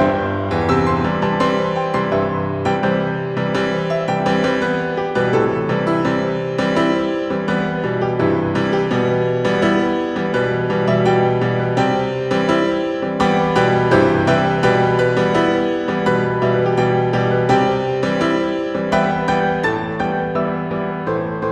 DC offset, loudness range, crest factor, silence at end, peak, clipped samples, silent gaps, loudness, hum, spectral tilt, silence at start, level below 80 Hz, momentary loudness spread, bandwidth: under 0.1%; 3 LU; 16 dB; 0 s; -2 dBFS; under 0.1%; none; -18 LUFS; none; -7 dB/octave; 0 s; -44 dBFS; 5 LU; 10.5 kHz